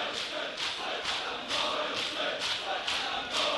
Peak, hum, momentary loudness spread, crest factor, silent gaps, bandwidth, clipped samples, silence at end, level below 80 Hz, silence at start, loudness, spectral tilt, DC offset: -16 dBFS; none; 3 LU; 18 dB; none; 11.5 kHz; under 0.1%; 0 s; -64 dBFS; 0 s; -31 LUFS; -1 dB/octave; under 0.1%